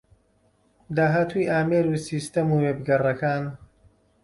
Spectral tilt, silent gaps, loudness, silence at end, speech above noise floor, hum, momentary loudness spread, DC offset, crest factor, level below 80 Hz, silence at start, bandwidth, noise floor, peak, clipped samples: -7 dB/octave; none; -24 LUFS; 0.6 s; 41 dB; none; 7 LU; under 0.1%; 14 dB; -58 dBFS; 0.9 s; 11.5 kHz; -64 dBFS; -10 dBFS; under 0.1%